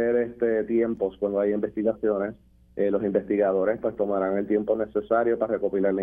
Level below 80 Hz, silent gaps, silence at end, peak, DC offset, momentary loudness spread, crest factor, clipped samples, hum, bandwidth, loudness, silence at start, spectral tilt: -56 dBFS; none; 0 s; -10 dBFS; under 0.1%; 4 LU; 16 dB; under 0.1%; none; 3.7 kHz; -25 LUFS; 0 s; -10.5 dB/octave